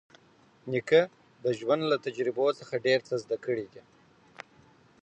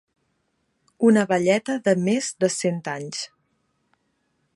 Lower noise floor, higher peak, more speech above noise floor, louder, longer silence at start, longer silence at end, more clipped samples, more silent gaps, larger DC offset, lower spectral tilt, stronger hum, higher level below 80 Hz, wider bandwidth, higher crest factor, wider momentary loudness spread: second, -61 dBFS vs -72 dBFS; second, -10 dBFS vs -6 dBFS; second, 33 dB vs 50 dB; second, -29 LUFS vs -22 LUFS; second, 0.65 s vs 1 s; about the same, 1.25 s vs 1.3 s; neither; neither; neither; about the same, -5.5 dB/octave vs -5 dB/octave; neither; second, -78 dBFS vs -72 dBFS; second, 8.4 kHz vs 11.5 kHz; about the same, 20 dB vs 18 dB; first, 23 LU vs 12 LU